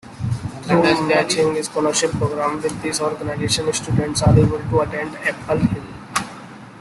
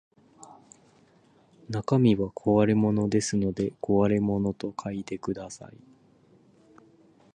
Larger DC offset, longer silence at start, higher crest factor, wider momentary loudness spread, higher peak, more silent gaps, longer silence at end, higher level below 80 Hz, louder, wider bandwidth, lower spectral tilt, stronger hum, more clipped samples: neither; second, 0.05 s vs 0.4 s; about the same, 18 dB vs 18 dB; about the same, 10 LU vs 12 LU; first, -2 dBFS vs -10 dBFS; neither; second, 0 s vs 1.65 s; first, -42 dBFS vs -56 dBFS; first, -19 LUFS vs -26 LUFS; first, 12.5 kHz vs 9.8 kHz; second, -5 dB/octave vs -7 dB/octave; neither; neither